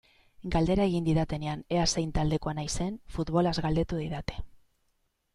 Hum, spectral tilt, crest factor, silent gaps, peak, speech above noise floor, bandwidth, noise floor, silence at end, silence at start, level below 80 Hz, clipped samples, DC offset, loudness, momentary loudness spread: none; -5.5 dB/octave; 18 dB; none; -12 dBFS; 46 dB; 11.5 kHz; -74 dBFS; 0.8 s; 0.4 s; -42 dBFS; under 0.1%; under 0.1%; -29 LUFS; 9 LU